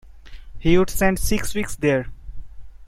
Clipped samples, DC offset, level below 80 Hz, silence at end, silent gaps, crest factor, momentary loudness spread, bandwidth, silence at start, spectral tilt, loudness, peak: under 0.1%; under 0.1%; -32 dBFS; 0 s; none; 20 dB; 8 LU; 16.5 kHz; 0.05 s; -5 dB/octave; -21 LUFS; -2 dBFS